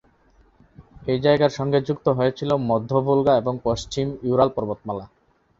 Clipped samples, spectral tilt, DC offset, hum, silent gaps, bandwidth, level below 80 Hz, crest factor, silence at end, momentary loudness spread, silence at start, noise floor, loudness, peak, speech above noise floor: under 0.1%; -7 dB/octave; under 0.1%; none; none; 7.8 kHz; -50 dBFS; 18 dB; 0.55 s; 10 LU; 0.8 s; -57 dBFS; -22 LUFS; -4 dBFS; 36 dB